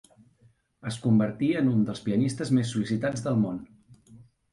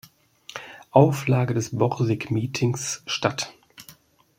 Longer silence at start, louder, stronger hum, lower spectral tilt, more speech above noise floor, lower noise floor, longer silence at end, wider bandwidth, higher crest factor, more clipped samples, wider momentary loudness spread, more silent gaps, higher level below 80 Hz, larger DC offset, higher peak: first, 0.85 s vs 0.55 s; second, -26 LUFS vs -23 LUFS; neither; first, -7 dB/octave vs -5.5 dB/octave; first, 37 dB vs 30 dB; first, -63 dBFS vs -52 dBFS; second, 0.3 s vs 0.45 s; second, 11.5 kHz vs 16 kHz; second, 16 dB vs 22 dB; neither; second, 7 LU vs 19 LU; neither; about the same, -62 dBFS vs -60 dBFS; neither; second, -12 dBFS vs -2 dBFS